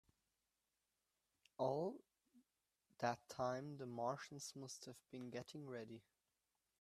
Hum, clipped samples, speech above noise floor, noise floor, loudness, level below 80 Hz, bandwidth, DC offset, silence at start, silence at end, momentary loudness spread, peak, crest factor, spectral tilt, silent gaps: none; under 0.1%; over 43 dB; under -90 dBFS; -48 LUFS; -86 dBFS; 13.5 kHz; under 0.1%; 1.6 s; 0.8 s; 13 LU; -26 dBFS; 24 dB; -5 dB/octave; none